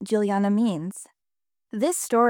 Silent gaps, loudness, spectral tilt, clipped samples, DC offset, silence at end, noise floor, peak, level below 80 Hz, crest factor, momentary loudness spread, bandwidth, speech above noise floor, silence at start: none; -24 LUFS; -5.5 dB/octave; under 0.1%; under 0.1%; 0 s; under -90 dBFS; -8 dBFS; -78 dBFS; 16 dB; 14 LU; 18.5 kHz; over 67 dB; 0 s